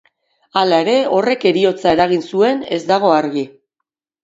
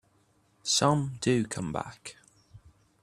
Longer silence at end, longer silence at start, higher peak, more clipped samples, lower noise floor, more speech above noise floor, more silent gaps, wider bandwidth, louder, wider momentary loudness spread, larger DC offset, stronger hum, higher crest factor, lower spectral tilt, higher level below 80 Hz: first, 0.75 s vs 0.45 s; about the same, 0.55 s vs 0.65 s; first, 0 dBFS vs -8 dBFS; neither; first, -79 dBFS vs -67 dBFS; first, 64 dB vs 39 dB; neither; second, 8 kHz vs 14.5 kHz; first, -15 LUFS vs -28 LUFS; second, 8 LU vs 18 LU; neither; neither; second, 16 dB vs 22 dB; first, -5.5 dB/octave vs -4 dB/octave; first, -56 dBFS vs -62 dBFS